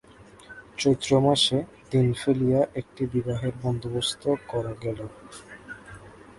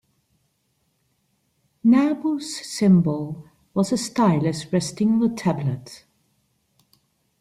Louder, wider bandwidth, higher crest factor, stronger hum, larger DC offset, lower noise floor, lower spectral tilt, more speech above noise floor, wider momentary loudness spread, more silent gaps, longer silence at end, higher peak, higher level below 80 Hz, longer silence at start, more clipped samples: second, -25 LUFS vs -22 LUFS; second, 11.5 kHz vs 13 kHz; about the same, 18 dB vs 16 dB; neither; neither; second, -49 dBFS vs -70 dBFS; about the same, -5.5 dB/octave vs -6.5 dB/octave; second, 24 dB vs 49 dB; first, 22 LU vs 12 LU; neither; second, 0.05 s vs 1.45 s; about the same, -8 dBFS vs -8 dBFS; first, -52 dBFS vs -60 dBFS; second, 0.2 s vs 1.85 s; neither